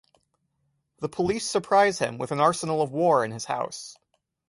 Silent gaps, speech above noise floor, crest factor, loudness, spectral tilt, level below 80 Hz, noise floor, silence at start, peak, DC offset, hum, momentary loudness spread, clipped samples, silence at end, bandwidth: none; 50 dB; 20 dB; -25 LUFS; -4.5 dB/octave; -62 dBFS; -74 dBFS; 1 s; -6 dBFS; under 0.1%; none; 13 LU; under 0.1%; 0.55 s; 11.5 kHz